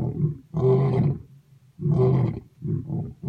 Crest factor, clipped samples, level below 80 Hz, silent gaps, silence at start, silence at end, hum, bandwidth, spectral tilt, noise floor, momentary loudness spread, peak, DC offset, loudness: 14 dB; under 0.1%; -48 dBFS; none; 0 s; 0 s; none; 4.7 kHz; -11.5 dB/octave; -53 dBFS; 11 LU; -10 dBFS; under 0.1%; -24 LUFS